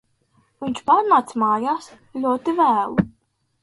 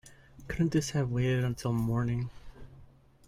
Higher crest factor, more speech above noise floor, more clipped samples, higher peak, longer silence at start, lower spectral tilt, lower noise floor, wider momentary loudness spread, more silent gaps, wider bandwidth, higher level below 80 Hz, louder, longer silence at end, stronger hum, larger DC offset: about the same, 18 dB vs 16 dB; first, 47 dB vs 27 dB; neither; first, -4 dBFS vs -16 dBFS; first, 0.6 s vs 0.05 s; about the same, -6.5 dB/octave vs -6.5 dB/octave; first, -66 dBFS vs -56 dBFS; first, 13 LU vs 7 LU; neither; second, 11.5 kHz vs 15 kHz; about the same, -54 dBFS vs -52 dBFS; first, -20 LUFS vs -31 LUFS; first, 0.55 s vs 0.4 s; neither; neither